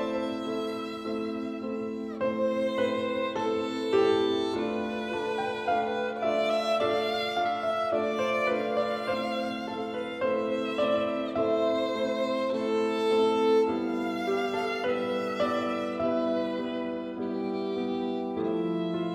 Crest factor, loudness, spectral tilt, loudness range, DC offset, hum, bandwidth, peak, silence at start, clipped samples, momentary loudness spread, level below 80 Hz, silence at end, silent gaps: 16 dB; -29 LUFS; -5.5 dB/octave; 3 LU; under 0.1%; none; 14 kHz; -14 dBFS; 0 s; under 0.1%; 8 LU; -66 dBFS; 0 s; none